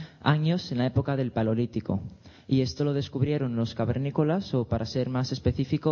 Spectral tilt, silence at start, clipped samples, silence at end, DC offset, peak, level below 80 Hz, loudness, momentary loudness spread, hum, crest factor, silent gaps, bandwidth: -7.5 dB/octave; 0 s; under 0.1%; 0 s; under 0.1%; -6 dBFS; -50 dBFS; -28 LUFS; 4 LU; none; 20 dB; none; 7 kHz